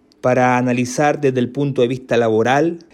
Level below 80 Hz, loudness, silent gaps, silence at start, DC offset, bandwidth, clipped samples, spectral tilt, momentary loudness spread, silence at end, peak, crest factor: -58 dBFS; -17 LUFS; none; 0.25 s; under 0.1%; 13 kHz; under 0.1%; -6 dB/octave; 4 LU; 0.15 s; -4 dBFS; 12 dB